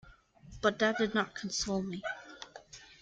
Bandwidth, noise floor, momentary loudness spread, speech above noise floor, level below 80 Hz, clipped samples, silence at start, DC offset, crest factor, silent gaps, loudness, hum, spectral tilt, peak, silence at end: 9.4 kHz; -56 dBFS; 20 LU; 24 dB; -60 dBFS; under 0.1%; 0.05 s; under 0.1%; 20 dB; none; -33 LUFS; none; -3.5 dB/octave; -14 dBFS; 0.1 s